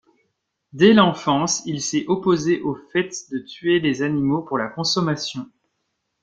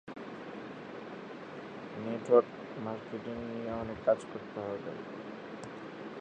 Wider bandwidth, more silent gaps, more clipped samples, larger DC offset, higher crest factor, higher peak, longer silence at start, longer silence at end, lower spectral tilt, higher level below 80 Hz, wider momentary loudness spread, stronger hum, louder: about the same, 9.2 kHz vs 9.2 kHz; neither; neither; neither; second, 20 dB vs 26 dB; first, -2 dBFS vs -10 dBFS; first, 0.75 s vs 0.05 s; first, 0.8 s vs 0 s; second, -4.5 dB/octave vs -7 dB/octave; first, -58 dBFS vs -66 dBFS; second, 11 LU vs 18 LU; neither; first, -20 LUFS vs -36 LUFS